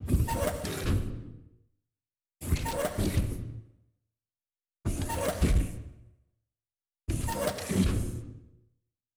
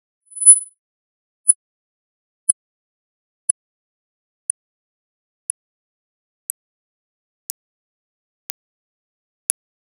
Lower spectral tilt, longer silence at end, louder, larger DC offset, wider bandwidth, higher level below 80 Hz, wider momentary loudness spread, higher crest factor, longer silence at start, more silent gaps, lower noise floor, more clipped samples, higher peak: first, -5.5 dB/octave vs 5 dB/octave; second, 0.7 s vs 7.5 s; second, -32 LUFS vs -16 LUFS; neither; first, over 20 kHz vs 10.5 kHz; first, -36 dBFS vs under -90 dBFS; second, 17 LU vs 27 LU; second, 18 dB vs 24 dB; second, 0 s vs 0.35 s; second, none vs 0.79-1.44 s, 1.55-2.47 s; about the same, under -90 dBFS vs under -90 dBFS; neither; second, -14 dBFS vs 0 dBFS